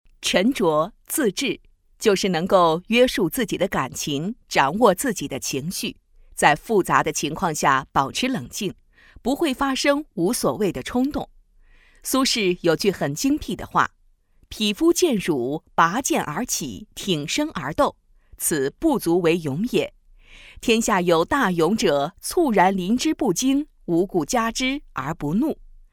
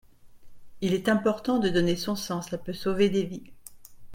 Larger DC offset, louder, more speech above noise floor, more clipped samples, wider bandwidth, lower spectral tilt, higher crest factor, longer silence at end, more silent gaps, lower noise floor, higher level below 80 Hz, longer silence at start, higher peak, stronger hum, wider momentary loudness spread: neither; first, -22 LUFS vs -27 LUFS; first, 36 dB vs 20 dB; neither; about the same, 18 kHz vs 16.5 kHz; second, -4 dB/octave vs -5.5 dB/octave; about the same, 22 dB vs 18 dB; first, 0.4 s vs 0 s; neither; first, -57 dBFS vs -46 dBFS; first, -48 dBFS vs -54 dBFS; about the same, 0.2 s vs 0.25 s; first, 0 dBFS vs -10 dBFS; neither; about the same, 8 LU vs 9 LU